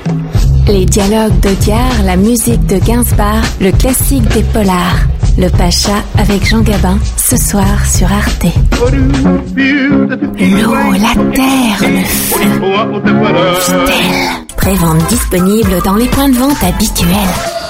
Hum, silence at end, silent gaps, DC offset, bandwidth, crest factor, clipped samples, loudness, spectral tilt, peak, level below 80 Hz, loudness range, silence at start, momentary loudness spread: none; 0 s; none; under 0.1%; 16.5 kHz; 8 dB; under 0.1%; -10 LUFS; -5 dB/octave; 0 dBFS; -16 dBFS; 1 LU; 0 s; 3 LU